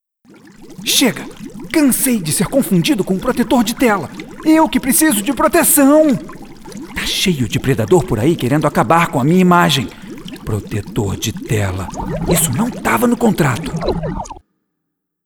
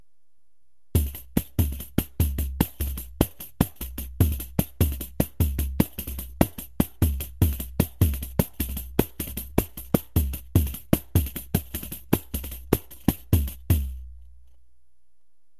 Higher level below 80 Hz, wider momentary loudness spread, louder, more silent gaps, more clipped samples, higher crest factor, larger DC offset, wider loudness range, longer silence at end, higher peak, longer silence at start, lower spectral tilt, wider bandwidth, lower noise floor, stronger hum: about the same, -36 dBFS vs -32 dBFS; first, 16 LU vs 7 LU; first, -14 LUFS vs -27 LUFS; neither; neither; second, 16 dB vs 26 dB; second, under 0.1% vs 0.5%; about the same, 4 LU vs 2 LU; second, 0.85 s vs 1.35 s; about the same, 0 dBFS vs -2 dBFS; second, 0.6 s vs 0.95 s; second, -4.5 dB/octave vs -6 dB/octave; first, over 20 kHz vs 14 kHz; second, -73 dBFS vs -79 dBFS; neither